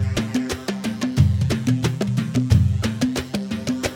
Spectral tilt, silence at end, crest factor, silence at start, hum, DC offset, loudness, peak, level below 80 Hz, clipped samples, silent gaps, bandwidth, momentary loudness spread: -6 dB/octave; 0 s; 16 dB; 0 s; none; under 0.1%; -22 LUFS; -4 dBFS; -36 dBFS; under 0.1%; none; 17 kHz; 8 LU